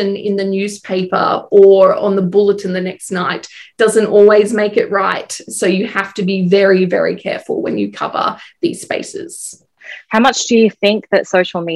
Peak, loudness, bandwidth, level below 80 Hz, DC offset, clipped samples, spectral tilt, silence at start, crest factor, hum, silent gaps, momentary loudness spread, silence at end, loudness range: 0 dBFS; -14 LUFS; 12.5 kHz; -62 dBFS; under 0.1%; under 0.1%; -5 dB/octave; 0 s; 14 dB; none; none; 13 LU; 0 s; 5 LU